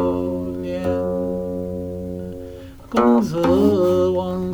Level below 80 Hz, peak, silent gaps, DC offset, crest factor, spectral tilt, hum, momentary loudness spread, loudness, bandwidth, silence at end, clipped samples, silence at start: -44 dBFS; -4 dBFS; none; under 0.1%; 16 dB; -8 dB/octave; none; 15 LU; -20 LUFS; over 20 kHz; 0 s; under 0.1%; 0 s